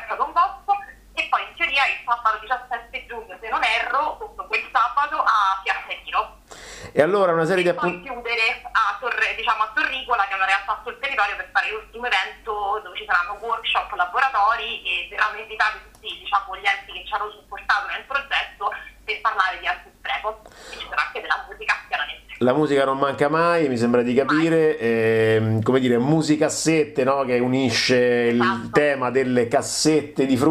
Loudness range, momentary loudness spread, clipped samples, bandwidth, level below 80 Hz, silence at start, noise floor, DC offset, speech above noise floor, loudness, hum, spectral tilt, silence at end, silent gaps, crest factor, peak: 5 LU; 10 LU; under 0.1%; 15 kHz; -52 dBFS; 0 s; -41 dBFS; under 0.1%; 21 dB; -21 LUFS; none; -4.5 dB/octave; 0 s; none; 18 dB; -4 dBFS